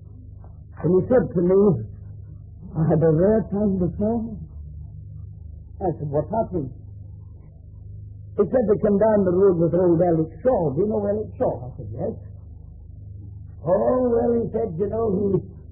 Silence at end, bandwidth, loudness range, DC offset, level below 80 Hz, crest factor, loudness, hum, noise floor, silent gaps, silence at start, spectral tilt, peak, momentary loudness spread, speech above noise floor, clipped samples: 0.1 s; 2.5 kHz; 9 LU; under 0.1%; -42 dBFS; 16 dB; -21 LUFS; none; -42 dBFS; none; 0 s; -14.5 dB/octave; -6 dBFS; 23 LU; 22 dB; under 0.1%